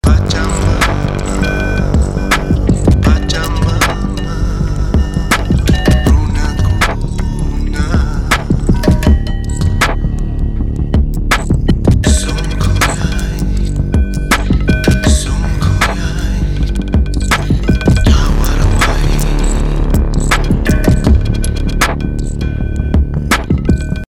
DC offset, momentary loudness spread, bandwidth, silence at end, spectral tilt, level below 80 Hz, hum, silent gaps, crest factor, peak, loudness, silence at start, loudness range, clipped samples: under 0.1%; 7 LU; 16 kHz; 0.05 s; -5.5 dB/octave; -14 dBFS; none; none; 12 dB; 0 dBFS; -14 LUFS; 0.05 s; 1 LU; under 0.1%